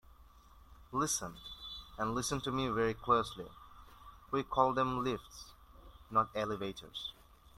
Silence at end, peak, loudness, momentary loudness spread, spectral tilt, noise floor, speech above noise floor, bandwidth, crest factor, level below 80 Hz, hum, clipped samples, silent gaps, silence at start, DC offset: 0.45 s; -14 dBFS; -36 LUFS; 20 LU; -4 dB/octave; -59 dBFS; 24 dB; 16 kHz; 24 dB; -58 dBFS; none; under 0.1%; none; 0.2 s; under 0.1%